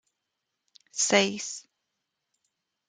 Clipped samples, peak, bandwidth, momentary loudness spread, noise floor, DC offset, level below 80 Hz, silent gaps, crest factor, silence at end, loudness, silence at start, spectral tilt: under 0.1%; -6 dBFS; 10 kHz; 16 LU; -83 dBFS; under 0.1%; -80 dBFS; none; 26 dB; 1.3 s; -25 LUFS; 0.95 s; -2 dB/octave